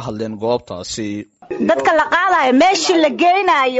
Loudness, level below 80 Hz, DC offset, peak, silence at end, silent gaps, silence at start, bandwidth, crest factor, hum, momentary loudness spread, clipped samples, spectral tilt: -15 LUFS; -52 dBFS; under 0.1%; -4 dBFS; 0 s; none; 0 s; 8 kHz; 12 dB; none; 13 LU; under 0.1%; -2 dB/octave